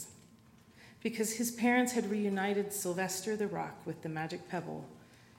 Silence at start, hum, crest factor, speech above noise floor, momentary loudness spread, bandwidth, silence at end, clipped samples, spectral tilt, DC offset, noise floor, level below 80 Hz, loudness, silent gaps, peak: 0 s; none; 18 dB; 26 dB; 13 LU; 16 kHz; 0.25 s; under 0.1%; -4 dB/octave; under 0.1%; -61 dBFS; -74 dBFS; -35 LUFS; none; -18 dBFS